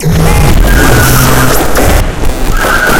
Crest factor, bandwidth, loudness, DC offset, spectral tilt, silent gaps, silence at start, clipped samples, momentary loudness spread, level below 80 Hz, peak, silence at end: 6 dB; 18 kHz; -8 LUFS; under 0.1%; -4.5 dB/octave; none; 0 s; 4%; 7 LU; -10 dBFS; 0 dBFS; 0 s